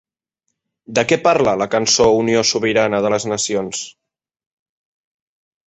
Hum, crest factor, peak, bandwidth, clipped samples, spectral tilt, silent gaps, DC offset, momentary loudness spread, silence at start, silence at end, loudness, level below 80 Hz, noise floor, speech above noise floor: none; 18 dB; -2 dBFS; 8.4 kHz; under 0.1%; -3 dB/octave; none; under 0.1%; 9 LU; 0.9 s; 1.75 s; -16 LUFS; -52 dBFS; -76 dBFS; 60 dB